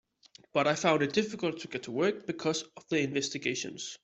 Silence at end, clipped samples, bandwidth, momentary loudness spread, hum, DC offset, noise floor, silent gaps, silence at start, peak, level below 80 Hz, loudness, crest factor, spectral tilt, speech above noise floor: 0.05 s; under 0.1%; 8.2 kHz; 9 LU; none; under 0.1%; -60 dBFS; none; 0.55 s; -10 dBFS; -72 dBFS; -31 LUFS; 22 dB; -4 dB/octave; 29 dB